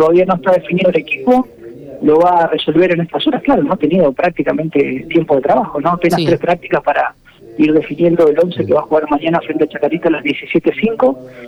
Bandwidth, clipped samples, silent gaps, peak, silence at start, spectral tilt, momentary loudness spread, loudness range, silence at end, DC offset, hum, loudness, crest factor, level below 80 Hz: 13 kHz; under 0.1%; none; -2 dBFS; 0 s; -7.5 dB/octave; 5 LU; 1 LU; 0 s; under 0.1%; none; -14 LUFS; 10 dB; -48 dBFS